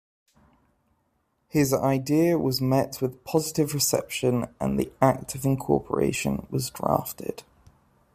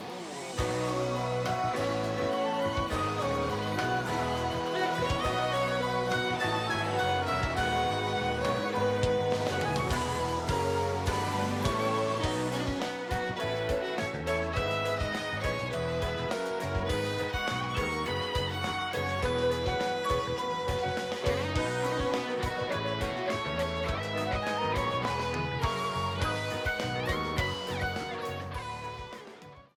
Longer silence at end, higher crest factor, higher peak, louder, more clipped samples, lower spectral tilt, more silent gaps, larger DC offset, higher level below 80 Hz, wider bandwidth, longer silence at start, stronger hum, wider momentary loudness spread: first, 0.75 s vs 0.15 s; about the same, 20 dB vs 16 dB; first, -6 dBFS vs -14 dBFS; first, -25 LUFS vs -31 LUFS; neither; about the same, -5.5 dB/octave vs -5 dB/octave; neither; neither; second, -54 dBFS vs -46 dBFS; second, 15.5 kHz vs 19 kHz; first, 1.55 s vs 0 s; neither; first, 7 LU vs 4 LU